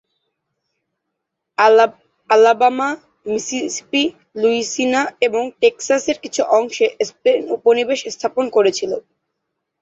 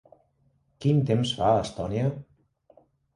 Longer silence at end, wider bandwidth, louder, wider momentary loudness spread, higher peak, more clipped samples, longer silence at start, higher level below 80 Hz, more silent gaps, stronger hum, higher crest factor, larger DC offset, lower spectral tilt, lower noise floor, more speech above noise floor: about the same, 0.8 s vs 0.9 s; second, 8 kHz vs 11 kHz; first, -17 LUFS vs -26 LUFS; first, 10 LU vs 7 LU; first, -2 dBFS vs -10 dBFS; neither; first, 1.6 s vs 0.8 s; second, -66 dBFS vs -54 dBFS; neither; neither; about the same, 16 dB vs 18 dB; neither; second, -2.5 dB/octave vs -7 dB/octave; first, -78 dBFS vs -68 dBFS; first, 61 dB vs 43 dB